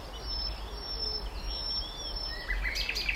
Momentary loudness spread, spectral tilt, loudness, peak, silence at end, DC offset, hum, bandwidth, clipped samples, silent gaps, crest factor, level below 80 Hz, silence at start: 6 LU; -2.5 dB/octave; -34 LUFS; -16 dBFS; 0 s; under 0.1%; none; 16 kHz; under 0.1%; none; 18 dB; -38 dBFS; 0 s